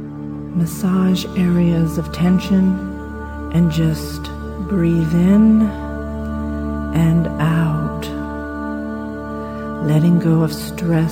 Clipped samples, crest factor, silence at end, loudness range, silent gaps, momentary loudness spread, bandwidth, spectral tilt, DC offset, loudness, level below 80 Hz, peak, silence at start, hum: under 0.1%; 14 dB; 0 s; 4 LU; none; 13 LU; 17 kHz; -7.5 dB/octave; under 0.1%; -18 LUFS; -32 dBFS; -4 dBFS; 0 s; none